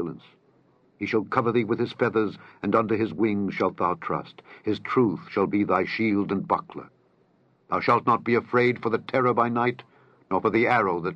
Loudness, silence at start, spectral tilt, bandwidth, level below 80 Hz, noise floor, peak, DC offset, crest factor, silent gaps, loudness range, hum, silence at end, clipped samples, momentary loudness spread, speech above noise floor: -25 LUFS; 0 s; -8 dB/octave; 7 kHz; -68 dBFS; -63 dBFS; -6 dBFS; under 0.1%; 20 dB; none; 3 LU; none; 0 s; under 0.1%; 10 LU; 39 dB